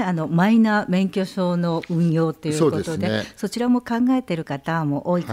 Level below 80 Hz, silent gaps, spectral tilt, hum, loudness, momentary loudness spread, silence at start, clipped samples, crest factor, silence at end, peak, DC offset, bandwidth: -56 dBFS; none; -7 dB/octave; none; -21 LUFS; 7 LU; 0 s; under 0.1%; 14 dB; 0 s; -6 dBFS; under 0.1%; 15 kHz